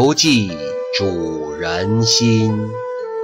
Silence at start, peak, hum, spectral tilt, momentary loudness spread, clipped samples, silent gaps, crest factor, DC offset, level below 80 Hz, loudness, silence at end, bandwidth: 0 s; -2 dBFS; none; -4 dB/octave; 11 LU; under 0.1%; none; 14 dB; under 0.1%; -48 dBFS; -17 LUFS; 0 s; 16 kHz